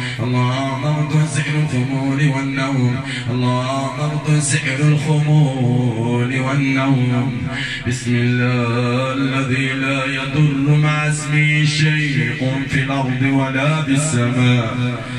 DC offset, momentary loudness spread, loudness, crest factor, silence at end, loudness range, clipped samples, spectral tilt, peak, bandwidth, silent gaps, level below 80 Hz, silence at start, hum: under 0.1%; 5 LU; -17 LUFS; 14 dB; 0 s; 2 LU; under 0.1%; -5.5 dB/octave; -4 dBFS; 11 kHz; none; -46 dBFS; 0 s; none